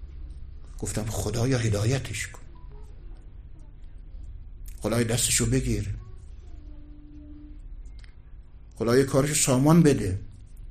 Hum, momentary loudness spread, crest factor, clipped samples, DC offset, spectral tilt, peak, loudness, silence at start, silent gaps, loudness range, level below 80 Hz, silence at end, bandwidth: none; 26 LU; 20 dB; under 0.1%; under 0.1%; -5 dB/octave; -6 dBFS; -24 LUFS; 0 s; none; 10 LU; -40 dBFS; 0 s; 15 kHz